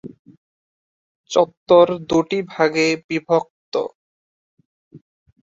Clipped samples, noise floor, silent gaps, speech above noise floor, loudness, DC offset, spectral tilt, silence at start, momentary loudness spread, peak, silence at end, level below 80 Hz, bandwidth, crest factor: under 0.1%; under -90 dBFS; 0.19-0.25 s, 0.37-1.24 s, 1.57-1.66 s, 3.04-3.09 s, 3.50-3.72 s, 3.95-4.57 s, 4.65-4.91 s; over 73 dB; -19 LUFS; under 0.1%; -5 dB/octave; 0.05 s; 11 LU; -2 dBFS; 0.6 s; -60 dBFS; 7.8 kHz; 20 dB